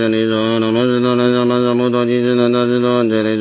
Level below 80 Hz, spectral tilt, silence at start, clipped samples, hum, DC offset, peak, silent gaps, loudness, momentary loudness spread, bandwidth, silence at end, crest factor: -56 dBFS; -11 dB/octave; 0 s; under 0.1%; none; under 0.1%; -2 dBFS; none; -15 LUFS; 2 LU; 4 kHz; 0 s; 12 dB